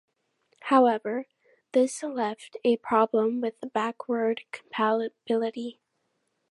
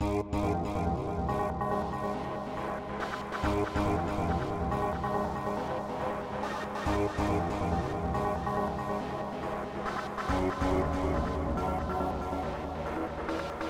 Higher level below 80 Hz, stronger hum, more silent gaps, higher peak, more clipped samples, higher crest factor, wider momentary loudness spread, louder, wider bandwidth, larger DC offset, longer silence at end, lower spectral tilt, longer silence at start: second, -82 dBFS vs -42 dBFS; neither; neither; first, -6 dBFS vs -18 dBFS; neither; first, 22 dB vs 14 dB; first, 12 LU vs 6 LU; first, -27 LUFS vs -32 LUFS; second, 11.5 kHz vs 16 kHz; neither; first, 0.8 s vs 0 s; second, -4.5 dB/octave vs -7 dB/octave; first, 0.65 s vs 0 s